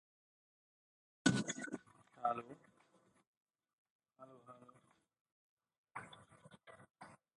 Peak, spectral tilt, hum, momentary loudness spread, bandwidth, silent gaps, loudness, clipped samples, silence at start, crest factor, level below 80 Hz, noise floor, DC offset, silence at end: -16 dBFS; -4 dB/octave; none; 26 LU; 11 kHz; 3.27-3.46 s, 3.73-3.99 s, 5.21-5.25 s, 5.32-5.57 s, 5.78-5.84 s; -41 LUFS; under 0.1%; 1.25 s; 32 dB; -80 dBFS; -74 dBFS; under 0.1%; 0.2 s